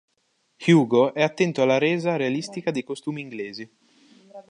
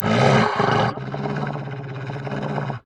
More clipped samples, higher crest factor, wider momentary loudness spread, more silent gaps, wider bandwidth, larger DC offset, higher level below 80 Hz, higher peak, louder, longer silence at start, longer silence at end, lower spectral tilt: neither; about the same, 18 dB vs 18 dB; about the same, 15 LU vs 14 LU; neither; about the same, 10.5 kHz vs 10 kHz; neither; second, -74 dBFS vs -50 dBFS; about the same, -6 dBFS vs -4 dBFS; about the same, -23 LUFS vs -22 LUFS; first, 0.6 s vs 0 s; about the same, 0.1 s vs 0.05 s; about the same, -6 dB/octave vs -6.5 dB/octave